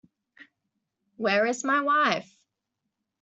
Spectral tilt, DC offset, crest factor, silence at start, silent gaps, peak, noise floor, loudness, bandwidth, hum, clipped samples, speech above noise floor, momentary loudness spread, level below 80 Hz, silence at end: -3.5 dB/octave; under 0.1%; 22 dB; 0.4 s; none; -8 dBFS; -83 dBFS; -25 LUFS; 8.2 kHz; none; under 0.1%; 59 dB; 8 LU; -78 dBFS; 1 s